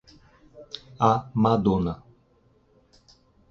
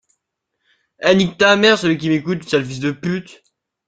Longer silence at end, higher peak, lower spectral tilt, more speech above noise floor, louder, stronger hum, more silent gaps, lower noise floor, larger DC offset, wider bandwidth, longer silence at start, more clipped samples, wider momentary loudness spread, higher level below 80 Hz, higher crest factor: first, 1.55 s vs 0.65 s; second, -4 dBFS vs 0 dBFS; first, -8 dB/octave vs -5 dB/octave; second, 40 dB vs 59 dB; second, -23 LUFS vs -16 LUFS; neither; neither; second, -62 dBFS vs -76 dBFS; neither; second, 6.8 kHz vs 9.2 kHz; second, 0.55 s vs 1 s; neither; first, 19 LU vs 11 LU; first, -50 dBFS vs -56 dBFS; about the same, 22 dB vs 18 dB